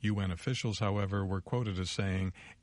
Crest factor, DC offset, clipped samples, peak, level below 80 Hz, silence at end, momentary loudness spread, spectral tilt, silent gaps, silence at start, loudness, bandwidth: 18 dB; under 0.1%; under 0.1%; -16 dBFS; -56 dBFS; 0.1 s; 2 LU; -6 dB/octave; none; 0 s; -34 LUFS; 11 kHz